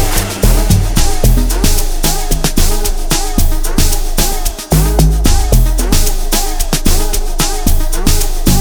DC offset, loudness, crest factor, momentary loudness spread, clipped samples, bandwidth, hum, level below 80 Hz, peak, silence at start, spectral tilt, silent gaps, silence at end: under 0.1%; -14 LUFS; 10 dB; 4 LU; under 0.1%; over 20 kHz; none; -12 dBFS; 0 dBFS; 0 s; -4 dB/octave; none; 0 s